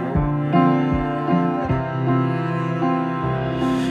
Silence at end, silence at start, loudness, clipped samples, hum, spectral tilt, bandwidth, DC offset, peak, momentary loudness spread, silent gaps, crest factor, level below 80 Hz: 0 s; 0 s; -21 LUFS; under 0.1%; none; -8.5 dB/octave; 9.6 kHz; under 0.1%; -4 dBFS; 5 LU; none; 16 dB; -36 dBFS